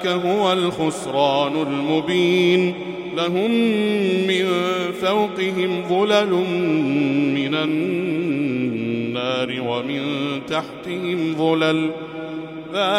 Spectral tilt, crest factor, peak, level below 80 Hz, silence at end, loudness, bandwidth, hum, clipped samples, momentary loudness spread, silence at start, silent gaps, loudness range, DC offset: -5.5 dB/octave; 16 dB; -4 dBFS; -62 dBFS; 0 s; -20 LUFS; 13.5 kHz; none; under 0.1%; 7 LU; 0 s; none; 4 LU; under 0.1%